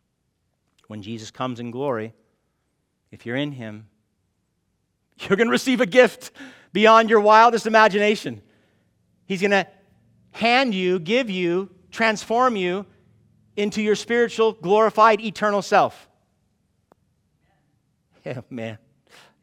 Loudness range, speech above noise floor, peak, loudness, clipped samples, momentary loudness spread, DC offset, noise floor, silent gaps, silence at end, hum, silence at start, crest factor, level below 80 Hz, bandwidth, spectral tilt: 15 LU; 52 dB; -2 dBFS; -19 LUFS; under 0.1%; 21 LU; under 0.1%; -72 dBFS; none; 0.65 s; none; 0.9 s; 20 dB; -68 dBFS; 15.5 kHz; -4.5 dB/octave